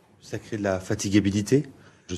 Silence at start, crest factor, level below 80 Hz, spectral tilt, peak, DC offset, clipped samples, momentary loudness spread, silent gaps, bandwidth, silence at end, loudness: 0.25 s; 18 dB; -60 dBFS; -5.5 dB/octave; -8 dBFS; under 0.1%; under 0.1%; 15 LU; none; 13.5 kHz; 0 s; -25 LUFS